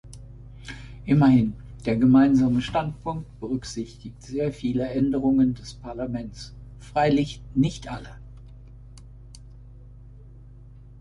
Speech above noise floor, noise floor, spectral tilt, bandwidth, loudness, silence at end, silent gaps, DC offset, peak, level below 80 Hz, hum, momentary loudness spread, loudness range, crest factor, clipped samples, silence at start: 23 dB; -46 dBFS; -7.5 dB/octave; 11 kHz; -23 LUFS; 0.7 s; none; under 0.1%; -8 dBFS; -44 dBFS; 50 Hz at -45 dBFS; 24 LU; 9 LU; 18 dB; under 0.1%; 0.05 s